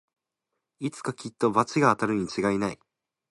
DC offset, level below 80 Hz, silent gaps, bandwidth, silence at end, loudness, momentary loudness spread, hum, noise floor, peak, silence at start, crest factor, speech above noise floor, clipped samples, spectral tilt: under 0.1%; -62 dBFS; none; 11.5 kHz; 0.6 s; -26 LUFS; 12 LU; none; -84 dBFS; -6 dBFS; 0.8 s; 22 dB; 58 dB; under 0.1%; -6 dB/octave